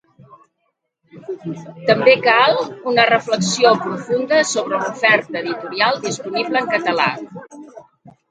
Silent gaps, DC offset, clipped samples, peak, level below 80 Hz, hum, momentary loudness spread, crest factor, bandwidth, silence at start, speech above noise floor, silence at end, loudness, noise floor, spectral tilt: none; under 0.1%; under 0.1%; 0 dBFS; -64 dBFS; none; 17 LU; 18 dB; 9.4 kHz; 1.15 s; 54 dB; 0.2 s; -16 LUFS; -71 dBFS; -3.5 dB/octave